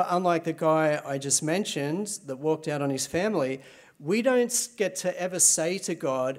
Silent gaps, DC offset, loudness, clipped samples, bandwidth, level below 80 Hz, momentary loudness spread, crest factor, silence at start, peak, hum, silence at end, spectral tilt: none; under 0.1%; -26 LUFS; under 0.1%; 16 kHz; -70 dBFS; 9 LU; 18 dB; 0 s; -8 dBFS; none; 0 s; -3.5 dB/octave